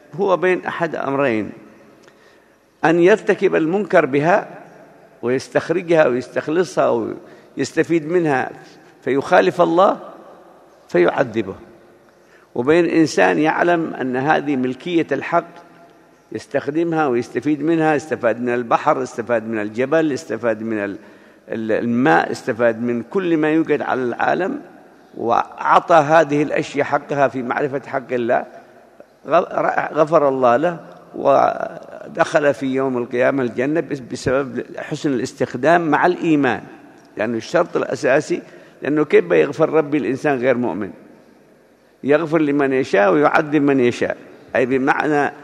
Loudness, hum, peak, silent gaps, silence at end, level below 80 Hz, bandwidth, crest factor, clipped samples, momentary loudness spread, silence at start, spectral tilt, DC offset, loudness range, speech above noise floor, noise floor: -18 LUFS; none; 0 dBFS; none; 0 s; -60 dBFS; 11 kHz; 18 dB; under 0.1%; 12 LU; 0.15 s; -6 dB/octave; under 0.1%; 3 LU; 35 dB; -53 dBFS